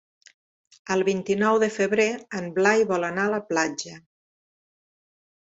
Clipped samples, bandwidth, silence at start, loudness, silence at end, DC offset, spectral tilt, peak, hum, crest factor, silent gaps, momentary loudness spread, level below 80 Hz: under 0.1%; 8 kHz; 0.85 s; -23 LUFS; 1.45 s; under 0.1%; -4.5 dB/octave; -6 dBFS; none; 20 dB; none; 11 LU; -68 dBFS